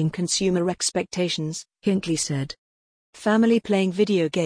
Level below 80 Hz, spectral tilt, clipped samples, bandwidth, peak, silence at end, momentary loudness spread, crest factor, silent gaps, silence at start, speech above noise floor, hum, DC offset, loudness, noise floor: -58 dBFS; -4.5 dB/octave; under 0.1%; 10.5 kHz; -8 dBFS; 0 s; 9 LU; 16 dB; 2.58-3.13 s; 0 s; over 67 dB; none; under 0.1%; -23 LUFS; under -90 dBFS